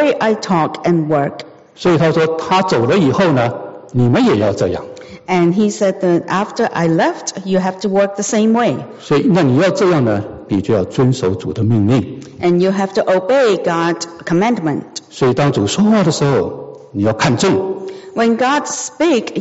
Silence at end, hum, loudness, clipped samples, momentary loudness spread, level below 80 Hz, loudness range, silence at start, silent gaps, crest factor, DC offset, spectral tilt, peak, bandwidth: 0 s; none; -15 LUFS; under 0.1%; 9 LU; -50 dBFS; 1 LU; 0 s; none; 12 dB; under 0.1%; -5.5 dB/octave; -2 dBFS; 8 kHz